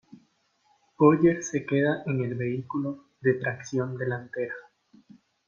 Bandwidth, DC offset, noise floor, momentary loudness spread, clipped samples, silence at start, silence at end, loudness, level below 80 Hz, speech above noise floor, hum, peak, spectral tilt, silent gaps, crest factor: 7.4 kHz; under 0.1%; -68 dBFS; 12 LU; under 0.1%; 1 s; 0.85 s; -27 LUFS; -68 dBFS; 42 dB; none; -8 dBFS; -7 dB/octave; none; 20 dB